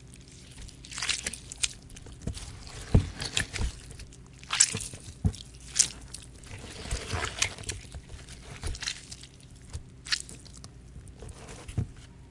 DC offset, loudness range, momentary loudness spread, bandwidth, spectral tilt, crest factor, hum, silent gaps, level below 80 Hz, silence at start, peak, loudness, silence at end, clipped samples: under 0.1%; 9 LU; 22 LU; 11.5 kHz; -2.5 dB/octave; 32 dB; none; none; -42 dBFS; 0 s; -2 dBFS; -31 LUFS; 0 s; under 0.1%